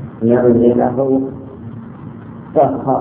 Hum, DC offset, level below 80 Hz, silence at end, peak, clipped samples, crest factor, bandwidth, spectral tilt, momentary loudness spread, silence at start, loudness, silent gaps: none; under 0.1%; -46 dBFS; 0 s; 0 dBFS; under 0.1%; 16 dB; 3.4 kHz; -13 dB/octave; 21 LU; 0 s; -14 LUFS; none